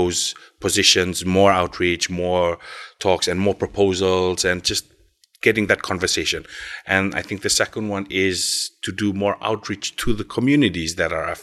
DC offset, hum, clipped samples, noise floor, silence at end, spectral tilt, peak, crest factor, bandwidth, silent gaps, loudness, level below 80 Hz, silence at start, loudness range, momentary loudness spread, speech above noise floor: under 0.1%; none; under 0.1%; -57 dBFS; 0 s; -3.5 dB/octave; -2 dBFS; 20 dB; 13 kHz; none; -20 LUFS; -44 dBFS; 0 s; 3 LU; 9 LU; 36 dB